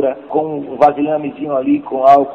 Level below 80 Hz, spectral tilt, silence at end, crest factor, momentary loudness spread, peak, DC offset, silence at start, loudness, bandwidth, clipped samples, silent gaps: -56 dBFS; -8 dB/octave; 0 s; 14 dB; 9 LU; 0 dBFS; under 0.1%; 0 s; -15 LUFS; 6.6 kHz; under 0.1%; none